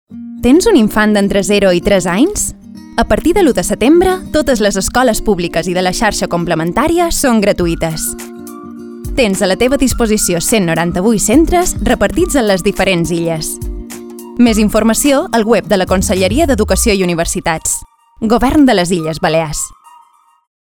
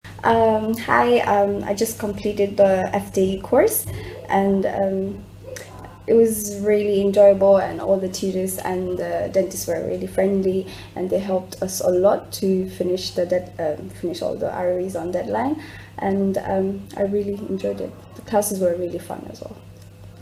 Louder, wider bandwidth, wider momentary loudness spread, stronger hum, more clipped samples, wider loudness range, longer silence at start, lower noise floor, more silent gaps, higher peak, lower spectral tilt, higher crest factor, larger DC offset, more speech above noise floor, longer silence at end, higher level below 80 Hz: first, -12 LUFS vs -21 LUFS; first, over 20 kHz vs 16 kHz; second, 10 LU vs 14 LU; neither; neither; second, 2 LU vs 6 LU; about the same, 0.1 s vs 0.05 s; first, -48 dBFS vs -42 dBFS; neither; about the same, 0 dBFS vs -2 dBFS; about the same, -4.5 dB/octave vs -5.5 dB/octave; second, 12 dB vs 20 dB; neither; first, 36 dB vs 21 dB; first, 0.85 s vs 0 s; first, -28 dBFS vs -50 dBFS